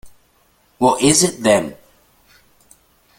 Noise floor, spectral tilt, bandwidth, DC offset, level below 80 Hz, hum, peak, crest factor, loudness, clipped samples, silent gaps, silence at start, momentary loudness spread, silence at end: -58 dBFS; -3.5 dB/octave; 17 kHz; under 0.1%; -52 dBFS; none; 0 dBFS; 20 dB; -15 LUFS; under 0.1%; none; 0.05 s; 6 LU; 1.45 s